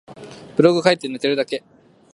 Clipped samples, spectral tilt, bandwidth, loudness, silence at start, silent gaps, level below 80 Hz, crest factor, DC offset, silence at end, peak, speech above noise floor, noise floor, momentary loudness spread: under 0.1%; -5.5 dB/octave; 11.5 kHz; -19 LUFS; 0.1 s; none; -66 dBFS; 20 dB; under 0.1%; 0.55 s; 0 dBFS; 21 dB; -39 dBFS; 19 LU